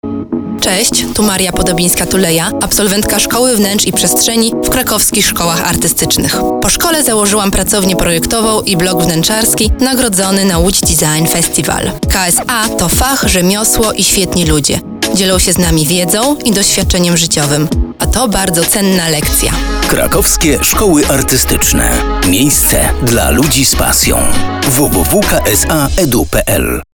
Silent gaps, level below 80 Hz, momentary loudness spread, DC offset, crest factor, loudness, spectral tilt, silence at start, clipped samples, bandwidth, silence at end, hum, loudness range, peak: none; -22 dBFS; 4 LU; under 0.1%; 10 dB; -10 LUFS; -3 dB/octave; 0.05 s; under 0.1%; over 20 kHz; 0.1 s; none; 1 LU; 0 dBFS